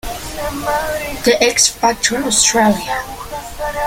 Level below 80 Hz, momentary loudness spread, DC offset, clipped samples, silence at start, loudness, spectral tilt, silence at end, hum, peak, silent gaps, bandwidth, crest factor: -36 dBFS; 14 LU; under 0.1%; under 0.1%; 0.05 s; -15 LUFS; -2 dB/octave; 0 s; none; 0 dBFS; none; 17 kHz; 16 dB